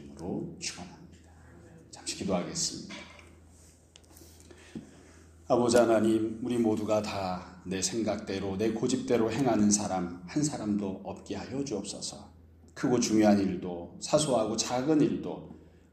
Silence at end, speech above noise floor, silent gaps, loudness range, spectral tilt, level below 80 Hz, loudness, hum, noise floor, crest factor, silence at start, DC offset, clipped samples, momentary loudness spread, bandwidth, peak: 0.35 s; 28 dB; none; 9 LU; -4.5 dB/octave; -60 dBFS; -29 LUFS; none; -57 dBFS; 20 dB; 0 s; under 0.1%; under 0.1%; 19 LU; 15 kHz; -10 dBFS